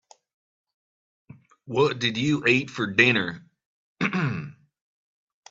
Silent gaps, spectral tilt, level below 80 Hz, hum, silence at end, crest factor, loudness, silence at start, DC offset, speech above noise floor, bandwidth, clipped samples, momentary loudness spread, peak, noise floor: 3.66-3.96 s; -5.5 dB/octave; -66 dBFS; none; 1 s; 24 dB; -23 LUFS; 1.65 s; under 0.1%; over 67 dB; 7.8 kHz; under 0.1%; 14 LU; -4 dBFS; under -90 dBFS